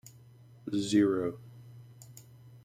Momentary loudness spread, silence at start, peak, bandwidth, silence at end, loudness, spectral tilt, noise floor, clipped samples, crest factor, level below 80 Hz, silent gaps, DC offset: 26 LU; 0.65 s; -14 dBFS; 15.5 kHz; 0.05 s; -30 LUFS; -5.5 dB/octave; -56 dBFS; under 0.1%; 20 dB; -70 dBFS; none; under 0.1%